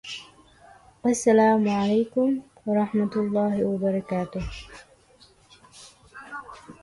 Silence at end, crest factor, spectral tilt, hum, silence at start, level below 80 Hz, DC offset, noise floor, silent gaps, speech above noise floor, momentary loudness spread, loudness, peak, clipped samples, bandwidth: 0.1 s; 18 dB; -6 dB/octave; none; 0.05 s; -50 dBFS; under 0.1%; -56 dBFS; none; 34 dB; 20 LU; -24 LUFS; -8 dBFS; under 0.1%; 11.5 kHz